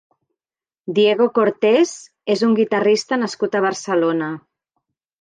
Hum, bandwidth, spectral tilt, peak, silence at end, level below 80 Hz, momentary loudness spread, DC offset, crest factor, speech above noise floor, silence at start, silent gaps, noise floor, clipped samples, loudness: none; 9.6 kHz; -4.5 dB/octave; -4 dBFS; 0.85 s; -72 dBFS; 9 LU; under 0.1%; 16 dB; over 73 dB; 0.85 s; none; under -90 dBFS; under 0.1%; -18 LUFS